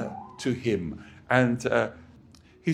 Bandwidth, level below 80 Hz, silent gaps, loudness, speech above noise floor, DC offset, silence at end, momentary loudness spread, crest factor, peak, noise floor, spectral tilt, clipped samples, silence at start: 12 kHz; -56 dBFS; none; -27 LUFS; 28 dB; under 0.1%; 0 s; 14 LU; 24 dB; -4 dBFS; -54 dBFS; -6.5 dB/octave; under 0.1%; 0 s